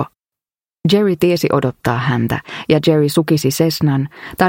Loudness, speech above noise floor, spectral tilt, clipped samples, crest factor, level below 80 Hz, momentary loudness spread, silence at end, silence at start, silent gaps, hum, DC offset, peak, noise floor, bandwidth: -16 LUFS; over 75 dB; -6 dB/octave; under 0.1%; 16 dB; -48 dBFS; 8 LU; 0 s; 0 s; none; none; under 0.1%; 0 dBFS; under -90 dBFS; 17 kHz